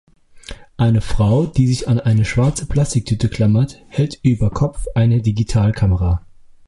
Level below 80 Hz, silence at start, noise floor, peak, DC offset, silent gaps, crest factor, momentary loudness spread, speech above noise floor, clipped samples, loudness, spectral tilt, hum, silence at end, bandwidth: -30 dBFS; 0.35 s; -36 dBFS; -2 dBFS; under 0.1%; none; 14 dB; 6 LU; 20 dB; under 0.1%; -17 LUFS; -7 dB/octave; none; 0.5 s; 11.5 kHz